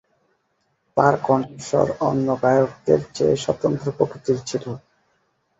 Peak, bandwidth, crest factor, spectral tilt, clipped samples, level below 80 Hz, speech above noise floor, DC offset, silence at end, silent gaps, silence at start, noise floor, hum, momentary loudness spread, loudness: -2 dBFS; 8 kHz; 20 dB; -6.5 dB/octave; under 0.1%; -54 dBFS; 49 dB; under 0.1%; 0.8 s; none; 0.95 s; -69 dBFS; none; 8 LU; -21 LUFS